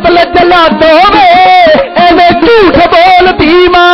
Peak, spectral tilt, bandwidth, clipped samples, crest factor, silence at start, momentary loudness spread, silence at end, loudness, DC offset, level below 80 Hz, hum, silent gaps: 0 dBFS; -5.5 dB/octave; 6.4 kHz; 2%; 4 dB; 0 s; 3 LU; 0 s; -3 LUFS; under 0.1%; -28 dBFS; none; none